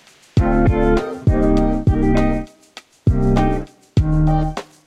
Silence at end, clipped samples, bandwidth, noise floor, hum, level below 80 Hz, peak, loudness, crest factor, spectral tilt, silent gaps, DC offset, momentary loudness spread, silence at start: 0.25 s; under 0.1%; 9.6 kHz; -44 dBFS; none; -22 dBFS; -2 dBFS; -18 LUFS; 14 dB; -8.5 dB/octave; none; under 0.1%; 7 LU; 0.35 s